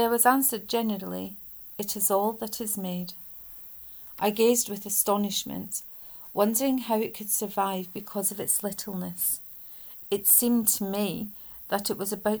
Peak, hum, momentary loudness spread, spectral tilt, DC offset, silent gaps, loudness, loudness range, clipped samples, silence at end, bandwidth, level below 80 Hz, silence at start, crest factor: -6 dBFS; none; 17 LU; -3 dB/octave; under 0.1%; none; -26 LUFS; 4 LU; under 0.1%; 0 s; over 20 kHz; -64 dBFS; 0 s; 22 dB